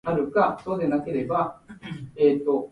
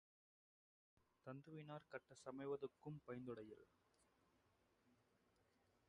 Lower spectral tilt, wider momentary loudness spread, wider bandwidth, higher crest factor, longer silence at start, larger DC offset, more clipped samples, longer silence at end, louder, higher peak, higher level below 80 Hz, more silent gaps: first, -8.5 dB/octave vs -7 dB/octave; first, 16 LU vs 10 LU; second, 5.6 kHz vs 10 kHz; about the same, 18 dB vs 20 dB; second, 0.05 s vs 1.25 s; neither; neither; second, 0.05 s vs 0.95 s; first, -24 LUFS vs -55 LUFS; first, -8 dBFS vs -38 dBFS; first, -58 dBFS vs -88 dBFS; neither